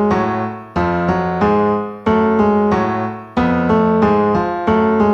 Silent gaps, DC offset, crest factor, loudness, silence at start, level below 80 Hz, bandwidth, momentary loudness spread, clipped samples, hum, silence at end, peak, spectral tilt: none; under 0.1%; 12 dB; -16 LUFS; 0 s; -40 dBFS; 6.6 kHz; 6 LU; under 0.1%; none; 0 s; -2 dBFS; -8.5 dB/octave